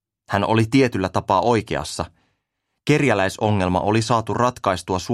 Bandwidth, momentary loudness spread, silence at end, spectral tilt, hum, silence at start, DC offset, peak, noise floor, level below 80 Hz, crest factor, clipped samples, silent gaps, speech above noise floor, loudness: 14 kHz; 9 LU; 0 s; -6 dB/octave; none; 0.3 s; under 0.1%; -2 dBFS; -77 dBFS; -48 dBFS; 18 dB; under 0.1%; none; 57 dB; -20 LUFS